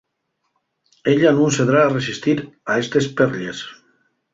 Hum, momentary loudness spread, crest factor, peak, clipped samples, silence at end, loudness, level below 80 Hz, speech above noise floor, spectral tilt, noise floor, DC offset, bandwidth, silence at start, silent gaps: none; 12 LU; 18 dB; -2 dBFS; under 0.1%; 0.6 s; -18 LUFS; -58 dBFS; 55 dB; -5.5 dB/octave; -73 dBFS; under 0.1%; 7.8 kHz; 1.05 s; none